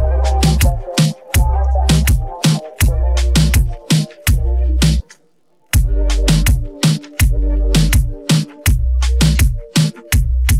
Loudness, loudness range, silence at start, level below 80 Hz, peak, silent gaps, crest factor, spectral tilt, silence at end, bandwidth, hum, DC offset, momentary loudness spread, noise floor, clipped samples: -16 LUFS; 1 LU; 0 s; -16 dBFS; -2 dBFS; none; 10 dB; -5 dB/octave; 0 s; 16.5 kHz; none; 0.3%; 4 LU; -59 dBFS; under 0.1%